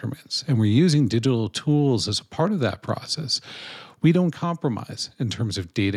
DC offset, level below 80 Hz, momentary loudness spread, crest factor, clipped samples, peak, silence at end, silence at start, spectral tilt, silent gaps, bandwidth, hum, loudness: under 0.1%; -60 dBFS; 10 LU; 16 dB; under 0.1%; -8 dBFS; 0 s; 0 s; -6 dB/octave; none; 13 kHz; none; -23 LUFS